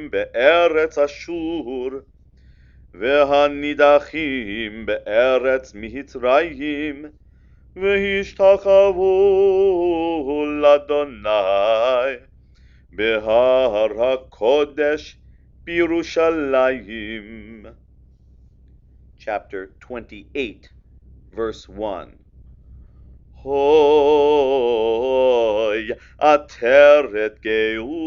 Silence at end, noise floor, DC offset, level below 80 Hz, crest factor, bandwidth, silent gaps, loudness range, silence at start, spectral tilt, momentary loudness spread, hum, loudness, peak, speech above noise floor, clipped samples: 0 s; -49 dBFS; under 0.1%; -46 dBFS; 18 dB; 7 kHz; none; 15 LU; 0 s; -5 dB/octave; 16 LU; none; -18 LUFS; 0 dBFS; 32 dB; under 0.1%